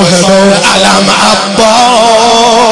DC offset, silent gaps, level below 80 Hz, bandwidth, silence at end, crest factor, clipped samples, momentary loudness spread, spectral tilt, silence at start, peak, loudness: 1%; none; -38 dBFS; 12 kHz; 0 s; 6 dB; 3%; 1 LU; -3 dB/octave; 0 s; 0 dBFS; -4 LUFS